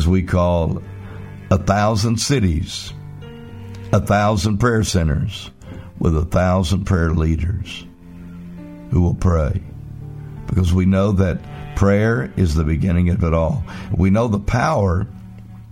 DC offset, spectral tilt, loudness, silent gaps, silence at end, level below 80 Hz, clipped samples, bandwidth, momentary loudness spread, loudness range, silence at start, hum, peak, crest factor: 0.3%; -6.5 dB/octave; -18 LUFS; none; 0 s; -30 dBFS; under 0.1%; 15.5 kHz; 19 LU; 3 LU; 0 s; none; 0 dBFS; 18 dB